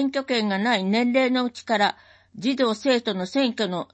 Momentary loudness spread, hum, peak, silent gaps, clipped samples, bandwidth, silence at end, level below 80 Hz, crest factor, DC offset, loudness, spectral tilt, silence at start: 5 LU; none; -8 dBFS; none; under 0.1%; 8.6 kHz; 0.1 s; -70 dBFS; 14 dB; under 0.1%; -23 LUFS; -5 dB/octave; 0 s